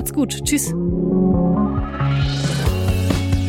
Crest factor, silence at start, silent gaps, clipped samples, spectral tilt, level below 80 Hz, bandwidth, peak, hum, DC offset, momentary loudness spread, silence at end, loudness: 16 dB; 0 s; none; under 0.1%; -5.5 dB/octave; -28 dBFS; 17 kHz; -2 dBFS; none; under 0.1%; 4 LU; 0 s; -19 LUFS